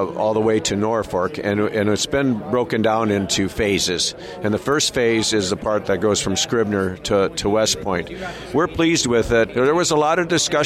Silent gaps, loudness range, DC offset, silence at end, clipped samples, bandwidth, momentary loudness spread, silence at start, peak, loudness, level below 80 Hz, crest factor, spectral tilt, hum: none; 1 LU; under 0.1%; 0 s; under 0.1%; 15.5 kHz; 5 LU; 0 s; -6 dBFS; -19 LUFS; -44 dBFS; 12 dB; -4 dB/octave; none